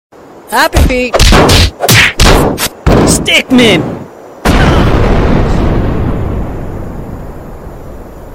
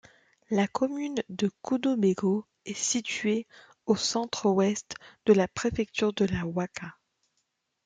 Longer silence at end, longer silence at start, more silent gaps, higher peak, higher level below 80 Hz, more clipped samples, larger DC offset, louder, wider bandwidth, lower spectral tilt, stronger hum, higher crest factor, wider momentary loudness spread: second, 0 s vs 0.95 s; second, 0.35 s vs 0.5 s; neither; first, 0 dBFS vs -8 dBFS; first, -14 dBFS vs -60 dBFS; first, 0.7% vs under 0.1%; neither; first, -8 LUFS vs -28 LUFS; first, 17.5 kHz vs 9.6 kHz; about the same, -4.5 dB/octave vs -4.5 dB/octave; neither; second, 8 dB vs 20 dB; first, 22 LU vs 11 LU